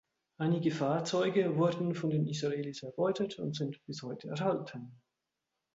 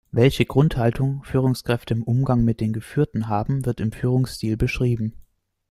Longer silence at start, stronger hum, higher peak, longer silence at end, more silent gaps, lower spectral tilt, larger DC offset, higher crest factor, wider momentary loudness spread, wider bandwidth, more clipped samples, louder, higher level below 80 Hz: first, 0.4 s vs 0.15 s; neither; second, -18 dBFS vs -2 dBFS; first, 0.8 s vs 0.5 s; neither; about the same, -6.5 dB/octave vs -7.5 dB/octave; neither; about the same, 16 dB vs 20 dB; first, 12 LU vs 6 LU; second, 8 kHz vs 14 kHz; neither; second, -33 LUFS vs -22 LUFS; second, -76 dBFS vs -40 dBFS